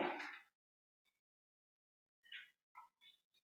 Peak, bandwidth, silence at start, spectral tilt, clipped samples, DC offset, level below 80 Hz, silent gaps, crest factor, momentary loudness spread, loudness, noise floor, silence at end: -30 dBFS; 16 kHz; 0 s; -4 dB/octave; under 0.1%; under 0.1%; under -90 dBFS; 0.55-1.05 s, 1.19-2.22 s, 2.63-2.75 s; 24 dB; 19 LU; -52 LUFS; under -90 dBFS; 0.35 s